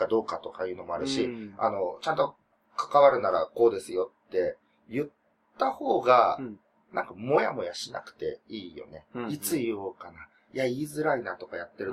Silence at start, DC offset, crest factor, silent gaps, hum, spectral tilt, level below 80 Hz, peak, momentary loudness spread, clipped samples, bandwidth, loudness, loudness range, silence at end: 0 s; under 0.1%; 22 dB; none; none; -4.5 dB/octave; -68 dBFS; -6 dBFS; 18 LU; under 0.1%; 15 kHz; -28 LUFS; 6 LU; 0 s